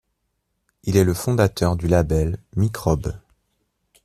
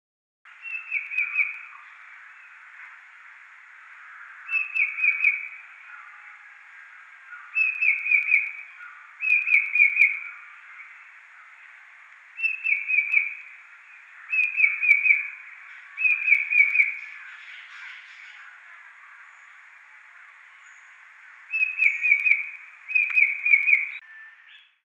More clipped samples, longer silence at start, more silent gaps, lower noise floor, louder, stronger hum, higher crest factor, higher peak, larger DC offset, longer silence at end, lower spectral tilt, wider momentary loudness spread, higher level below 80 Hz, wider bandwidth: neither; first, 0.85 s vs 0.6 s; neither; first, -73 dBFS vs -53 dBFS; about the same, -21 LUFS vs -20 LUFS; neither; about the same, 18 dB vs 22 dB; first, -2 dBFS vs -6 dBFS; neither; first, 0.9 s vs 0.55 s; first, -6.5 dB/octave vs 4 dB/octave; second, 9 LU vs 26 LU; first, -38 dBFS vs under -90 dBFS; first, 14.5 kHz vs 8.8 kHz